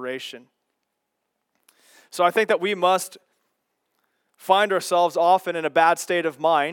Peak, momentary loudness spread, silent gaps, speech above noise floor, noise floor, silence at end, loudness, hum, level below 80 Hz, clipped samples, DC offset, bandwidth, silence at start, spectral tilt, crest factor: -4 dBFS; 14 LU; none; 57 dB; -78 dBFS; 0 s; -21 LUFS; none; -90 dBFS; under 0.1%; under 0.1%; 18 kHz; 0 s; -3 dB/octave; 20 dB